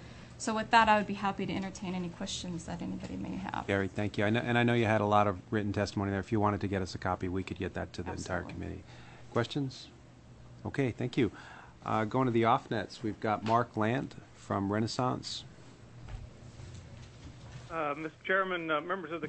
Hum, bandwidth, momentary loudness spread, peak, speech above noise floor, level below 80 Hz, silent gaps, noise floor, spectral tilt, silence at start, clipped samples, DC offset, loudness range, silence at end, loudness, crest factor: none; 8.6 kHz; 21 LU; -10 dBFS; 22 dB; -58 dBFS; none; -54 dBFS; -6 dB/octave; 0 s; under 0.1%; under 0.1%; 7 LU; 0 s; -32 LUFS; 22 dB